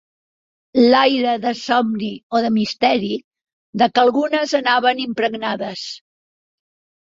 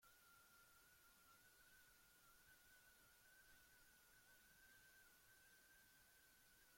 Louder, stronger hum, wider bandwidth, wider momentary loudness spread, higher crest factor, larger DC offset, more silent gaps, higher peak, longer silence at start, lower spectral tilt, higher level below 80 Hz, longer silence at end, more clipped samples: first, -18 LUFS vs -70 LUFS; neither; second, 7.8 kHz vs 16.5 kHz; first, 12 LU vs 1 LU; about the same, 18 dB vs 14 dB; neither; first, 2.23-2.30 s, 3.24-3.31 s, 3.53-3.73 s vs none; first, -2 dBFS vs -58 dBFS; first, 0.75 s vs 0 s; first, -4.5 dB/octave vs -1 dB/octave; first, -62 dBFS vs -86 dBFS; first, 1.05 s vs 0 s; neither